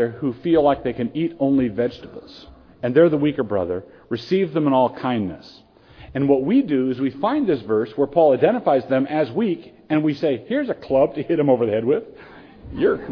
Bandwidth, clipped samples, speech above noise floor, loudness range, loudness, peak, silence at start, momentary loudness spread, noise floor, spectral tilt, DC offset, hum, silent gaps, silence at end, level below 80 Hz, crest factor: 5.4 kHz; under 0.1%; 25 dB; 2 LU; -20 LUFS; -4 dBFS; 0 s; 12 LU; -45 dBFS; -9 dB/octave; under 0.1%; none; none; 0 s; -52 dBFS; 18 dB